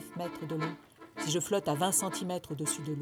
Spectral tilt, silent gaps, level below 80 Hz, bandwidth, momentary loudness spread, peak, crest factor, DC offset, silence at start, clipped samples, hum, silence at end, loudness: -3.5 dB/octave; none; -70 dBFS; over 20 kHz; 11 LU; -14 dBFS; 20 dB; under 0.1%; 0 s; under 0.1%; none; 0 s; -33 LUFS